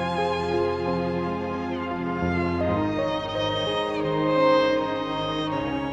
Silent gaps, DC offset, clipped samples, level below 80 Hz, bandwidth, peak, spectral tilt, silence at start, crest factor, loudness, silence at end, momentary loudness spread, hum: none; under 0.1%; under 0.1%; -48 dBFS; 9 kHz; -8 dBFS; -6.5 dB/octave; 0 s; 16 dB; -25 LUFS; 0 s; 7 LU; none